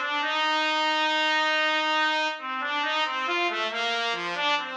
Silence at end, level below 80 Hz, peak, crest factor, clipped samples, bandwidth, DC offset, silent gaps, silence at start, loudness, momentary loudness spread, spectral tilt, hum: 0 s; -88 dBFS; -12 dBFS; 14 dB; under 0.1%; 9.2 kHz; under 0.1%; none; 0 s; -24 LUFS; 4 LU; -1 dB/octave; none